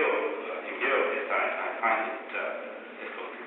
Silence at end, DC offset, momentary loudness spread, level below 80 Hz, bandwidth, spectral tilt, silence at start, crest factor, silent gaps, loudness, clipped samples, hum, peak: 0 s; under 0.1%; 12 LU; under -90 dBFS; 4.2 kHz; 0.5 dB/octave; 0 s; 16 dB; none; -30 LUFS; under 0.1%; none; -14 dBFS